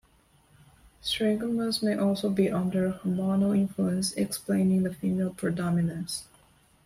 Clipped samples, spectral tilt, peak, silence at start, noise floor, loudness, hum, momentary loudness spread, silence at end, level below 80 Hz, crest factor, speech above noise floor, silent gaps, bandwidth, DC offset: under 0.1%; -6 dB/octave; -12 dBFS; 1.05 s; -62 dBFS; -28 LUFS; none; 6 LU; 0.6 s; -60 dBFS; 16 dB; 36 dB; none; 15.5 kHz; under 0.1%